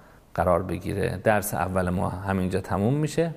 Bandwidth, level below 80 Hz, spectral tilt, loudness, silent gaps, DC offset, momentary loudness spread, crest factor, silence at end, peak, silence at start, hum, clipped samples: 15.5 kHz; -48 dBFS; -6.5 dB/octave; -26 LUFS; none; under 0.1%; 5 LU; 20 dB; 0 s; -6 dBFS; 0.35 s; none; under 0.1%